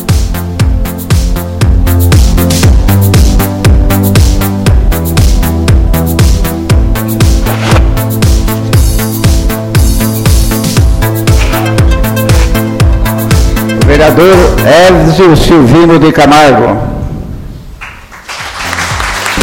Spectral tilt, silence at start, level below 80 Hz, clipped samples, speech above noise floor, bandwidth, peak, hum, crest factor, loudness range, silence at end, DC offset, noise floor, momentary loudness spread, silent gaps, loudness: -5.5 dB/octave; 0 s; -12 dBFS; 3%; 23 dB; 17 kHz; 0 dBFS; none; 6 dB; 5 LU; 0 s; under 0.1%; -26 dBFS; 10 LU; none; -7 LUFS